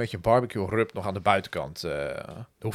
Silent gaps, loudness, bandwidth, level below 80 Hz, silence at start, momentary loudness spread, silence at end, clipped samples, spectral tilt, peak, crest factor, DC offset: none; -27 LUFS; 16 kHz; -52 dBFS; 0 s; 12 LU; 0 s; under 0.1%; -6 dB/octave; -4 dBFS; 22 dB; under 0.1%